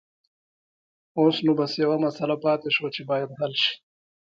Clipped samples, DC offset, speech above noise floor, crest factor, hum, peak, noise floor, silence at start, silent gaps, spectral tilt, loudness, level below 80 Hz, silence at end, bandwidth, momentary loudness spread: under 0.1%; under 0.1%; over 66 dB; 18 dB; none; -8 dBFS; under -90 dBFS; 1.15 s; none; -6 dB/octave; -24 LUFS; -74 dBFS; 0.6 s; 7.4 kHz; 6 LU